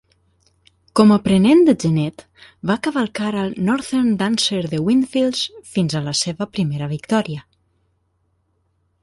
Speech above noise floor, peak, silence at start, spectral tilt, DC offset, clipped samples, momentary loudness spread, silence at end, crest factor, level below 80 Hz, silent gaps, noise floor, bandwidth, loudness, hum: 48 dB; -2 dBFS; 0.95 s; -5.5 dB/octave; under 0.1%; under 0.1%; 10 LU; 1.6 s; 18 dB; -54 dBFS; none; -66 dBFS; 11.5 kHz; -18 LUFS; none